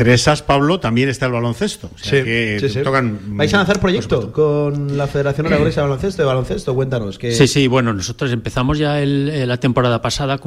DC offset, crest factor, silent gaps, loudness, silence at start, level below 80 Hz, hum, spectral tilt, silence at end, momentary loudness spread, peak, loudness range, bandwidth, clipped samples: under 0.1%; 14 dB; none; -17 LUFS; 0 s; -36 dBFS; none; -5.5 dB/octave; 0 s; 6 LU; -2 dBFS; 1 LU; 13.5 kHz; under 0.1%